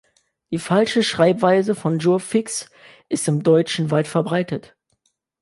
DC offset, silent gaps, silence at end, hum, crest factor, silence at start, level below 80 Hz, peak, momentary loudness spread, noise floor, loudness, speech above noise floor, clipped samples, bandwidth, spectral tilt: under 0.1%; none; 0.8 s; none; 18 dB; 0.5 s; -64 dBFS; -2 dBFS; 11 LU; -69 dBFS; -20 LUFS; 50 dB; under 0.1%; 11.5 kHz; -5.5 dB/octave